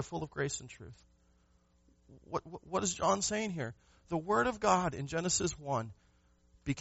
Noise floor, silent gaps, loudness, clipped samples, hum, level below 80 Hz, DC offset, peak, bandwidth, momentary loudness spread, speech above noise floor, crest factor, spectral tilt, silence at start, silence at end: -69 dBFS; none; -34 LUFS; under 0.1%; none; -60 dBFS; under 0.1%; -14 dBFS; 8 kHz; 14 LU; 35 dB; 22 dB; -4.5 dB/octave; 0 s; 0 s